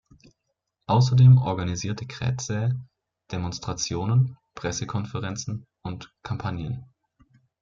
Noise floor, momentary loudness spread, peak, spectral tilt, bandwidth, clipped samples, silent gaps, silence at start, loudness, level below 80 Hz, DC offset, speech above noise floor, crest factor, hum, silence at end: -79 dBFS; 19 LU; -8 dBFS; -6 dB/octave; 7.4 kHz; under 0.1%; none; 0.9 s; -25 LUFS; -54 dBFS; under 0.1%; 56 dB; 18 dB; none; 0.75 s